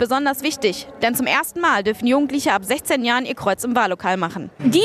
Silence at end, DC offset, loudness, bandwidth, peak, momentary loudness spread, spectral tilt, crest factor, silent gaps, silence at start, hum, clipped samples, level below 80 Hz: 0 s; under 0.1%; -20 LUFS; 14.5 kHz; -4 dBFS; 4 LU; -3.5 dB/octave; 16 dB; none; 0 s; none; under 0.1%; -56 dBFS